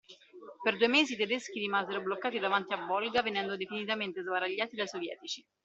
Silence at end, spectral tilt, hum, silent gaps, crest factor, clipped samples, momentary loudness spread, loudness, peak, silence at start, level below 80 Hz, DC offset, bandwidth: 0.25 s; -3.5 dB/octave; none; none; 22 dB; under 0.1%; 11 LU; -32 LUFS; -12 dBFS; 0.1 s; -78 dBFS; under 0.1%; 8.2 kHz